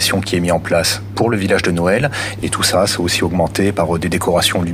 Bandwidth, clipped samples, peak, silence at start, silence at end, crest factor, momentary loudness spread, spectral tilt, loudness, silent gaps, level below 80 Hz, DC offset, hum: 16 kHz; under 0.1%; -4 dBFS; 0 s; 0 s; 12 dB; 4 LU; -4 dB/octave; -16 LUFS; none; -42 dBFS; under 0.1%; none